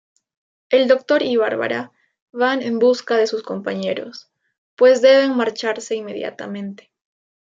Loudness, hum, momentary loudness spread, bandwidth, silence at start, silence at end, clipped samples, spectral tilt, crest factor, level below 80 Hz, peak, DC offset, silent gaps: -18 LUFS; none; 16 LU; 7.8 kHz; 0.7 s; 0.7 s; under 0.1%; -4.5 dB/octave; 18 dB; -72 dBFS; -2 dBFS; under 0.1%; 2.22-2.28 s, 4.58-4.77 s